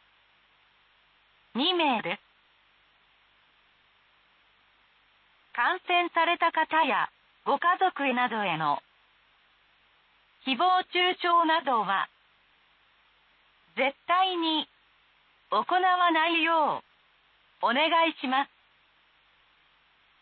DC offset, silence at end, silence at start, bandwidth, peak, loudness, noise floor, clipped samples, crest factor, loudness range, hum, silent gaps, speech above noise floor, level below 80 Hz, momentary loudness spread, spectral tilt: under 0.1%; 1.75 s; 1.55 s; 4.7 kHz; -12 dBFS; -26 LUFS; -64 dBFS; under 0.1%; 16 dB; 6 LU; none; none; 39 dB; -82 dBFS; 12 LU; -7 dB/octave